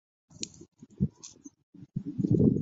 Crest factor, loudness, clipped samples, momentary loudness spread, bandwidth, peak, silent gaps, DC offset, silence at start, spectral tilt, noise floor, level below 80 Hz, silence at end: 22 dB; -32 LUFS; under 0.1%; 28 LU; 8 kHz; -10 dBFS; 1.63-1.73 s; under 0.1%; 0.4 s; -7.5 dB/octave; -51 dBFS; -52 dBFS; 0 s